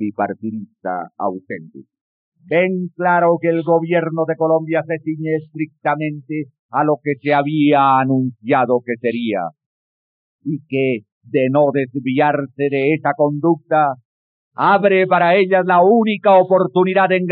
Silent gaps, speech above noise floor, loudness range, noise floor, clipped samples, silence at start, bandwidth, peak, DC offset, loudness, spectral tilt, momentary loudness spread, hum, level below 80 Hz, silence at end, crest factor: 2.01-2.32 s, 6.59-6.69 s, 9.66-10.39 s, 11.12-11.21 s, 14.05-14.51 s; over 74 dB; 6 LU; under -90 dBFS; under 0.1%; 0 s; 4.7 kHz; -2 dBFS; under 0.1%; -17 LUFS; -5.5 dB/octave; 13 LU; none; -86 dBFS; 0 s; 14 dB